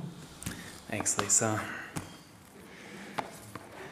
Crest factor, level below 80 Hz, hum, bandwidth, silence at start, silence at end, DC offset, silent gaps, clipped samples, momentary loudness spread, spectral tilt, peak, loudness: 28 dB; -62 dBFS; none; 16 kHz; 0 s; 0 s; under 0.1%; none; under 0.1%; 24 LU; -2.5 dB/octave; -8 dBFS; -31 LUFS